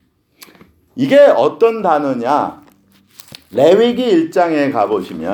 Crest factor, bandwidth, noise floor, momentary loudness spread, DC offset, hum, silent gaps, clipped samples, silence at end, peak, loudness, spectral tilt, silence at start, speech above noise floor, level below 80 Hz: 14 dB; over 20 kHz; -51 dBFS; 11 LU; under 0.1%; none; none; under 0.1%; 0 s; 0 dBFS; -13 LUFS; -6 dB/octave; 0.95 s; 38 dB; -60 dBFS